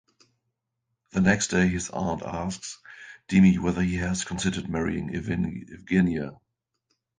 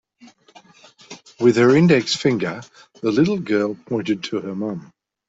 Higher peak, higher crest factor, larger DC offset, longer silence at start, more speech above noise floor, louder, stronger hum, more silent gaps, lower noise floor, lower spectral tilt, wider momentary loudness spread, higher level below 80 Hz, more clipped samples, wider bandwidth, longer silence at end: about the same, -4 dBFS vs -2 dBFS; about the same, 22 dB vs 18 dB; neither; about the same, 1.15 s vs 1.1 s; first, 56 dB vs 32 dB; second, -25 LUFS vs -19 LUFS; neither; neither; first, -81 dBFS vs -50 dBFS; about the same, -5.5 dB/octave vs -6 dB/octave; second, 17 LU vs 21 LU; first, -46 dBFS vs -58 dBFS; neither; first, 9.6 kHz vs 8 kHz; first, 0.85 s vs 0.5 s